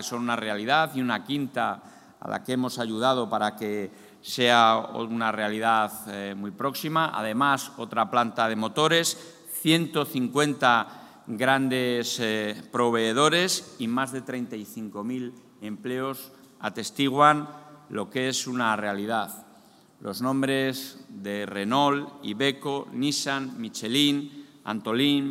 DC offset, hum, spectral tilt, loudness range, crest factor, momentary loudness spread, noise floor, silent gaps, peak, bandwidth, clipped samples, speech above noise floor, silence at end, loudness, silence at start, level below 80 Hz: under 0.1%; none; -4 dB/octave; 4 LU; 22 dB; 15 LU; -55 dBFS; none; -4 dBFS; 16 kHz; under 0.1%; 29 dB; 0 s; -26 LUFS; 0 s; -76 dBFS